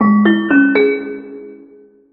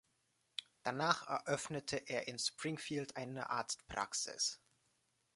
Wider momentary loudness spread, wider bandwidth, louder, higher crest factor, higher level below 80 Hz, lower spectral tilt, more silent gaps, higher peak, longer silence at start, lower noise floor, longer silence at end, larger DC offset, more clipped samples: first, 21 LU vs 9 LU; second, 4.2 kHz vs 11.5 kHz; first, -13 LUFS vs -40 LUFS; second, 14 dB vs 28 dB; first, -58 dBFS vs -74 dBFS; first, -9.5 dB/octave vs -2.5 dB/octave; neither; first, 0 dBFS vs -16 dBFS; second, 0 s vs 0.6 s; second, -44 dBFS vs -80 dBFS; second, 0.55 s vs 0.8 s; neither; neither